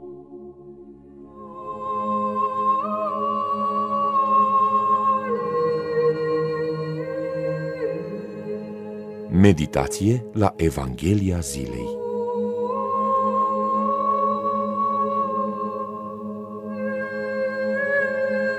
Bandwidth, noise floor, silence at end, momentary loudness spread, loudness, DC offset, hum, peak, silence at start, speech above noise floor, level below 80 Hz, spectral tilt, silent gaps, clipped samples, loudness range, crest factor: 15 kHz; -44 dBFS; 0 s; 14 LU; -23 LUFS; under 0.1%; none; -4 dBFS; 0 s; 22 dB; -46 dBFS; -6.5 dB/octave; none; under 0.1%; 5 LU; 20 dB